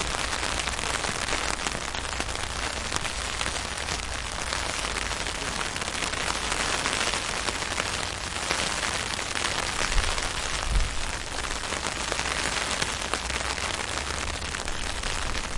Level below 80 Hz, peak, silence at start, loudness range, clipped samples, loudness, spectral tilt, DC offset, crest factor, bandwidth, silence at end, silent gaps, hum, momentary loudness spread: -36 dBFS; -4 dBFS; 0 s; 2 LU; under 0.1%; -28 LUFS; -2 dB/octave; under 0.1%; 24 dB; 11.5 kHz; 0 s; none; none; 4 LU